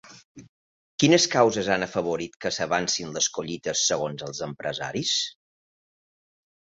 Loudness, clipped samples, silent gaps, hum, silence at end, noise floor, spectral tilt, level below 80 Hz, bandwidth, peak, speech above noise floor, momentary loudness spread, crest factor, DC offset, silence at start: -24 LUFS; under 0.1%; 0.25-0.35 s, 0.49-0.98 s, 2.36-2.40 s; none; 1.45 s; under -90 dBFS; -3 dB/octave; -62 dBFS; 8 kHz; -4 dBFS; over 65 dB; 12 LU; 22 dB; under 0.1%; 0.05 s